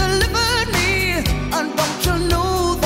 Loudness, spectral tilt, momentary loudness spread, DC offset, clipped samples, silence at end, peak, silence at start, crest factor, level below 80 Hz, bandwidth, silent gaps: -18 LUFS; -4 dB/octave; 4 LU; under 0.1%; under 0.1%; 0 s; -4 dBFS; 0 s; 14 dB; -26 dBFS; 16.5 kHz; none